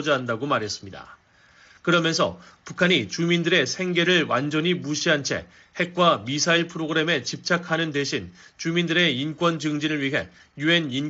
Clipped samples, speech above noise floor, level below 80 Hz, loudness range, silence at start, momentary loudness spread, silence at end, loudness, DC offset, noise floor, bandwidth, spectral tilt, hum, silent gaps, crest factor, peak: under 0.1%; 32 dB; -62 dBFS; 2 LU; 0 s; 11 LU; 0 s; -23 LUFS; under 0.1%; -55 dBFS; 8 kHz; -3 dB/octave; none; none; 18 dB; -6 dBFS